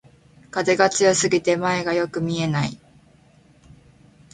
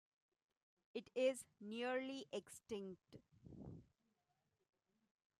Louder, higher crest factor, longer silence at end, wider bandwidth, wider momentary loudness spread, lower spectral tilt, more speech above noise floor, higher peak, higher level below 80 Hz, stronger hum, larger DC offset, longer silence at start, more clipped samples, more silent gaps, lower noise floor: first, -21 LUFS vs -46 LUFS; about the same, 20 dB vs 22 dB; about the same, 1.55 s vs 1.55 s; second, 9.6 kHz vs 13.5 kHz; second, 9 LU vs 22 LU; about the same, -4 dB/octave vs -4 dB/octave; second, 34 dB vs 40 dB; first, -2 dBFS vs -28 dBFS; first, -56 dBFS vs -80 dBFS; neither; neither; second, 0.55 s vs 0.95 s; neither; neither; second, -54 dBFS vs -87 dBFS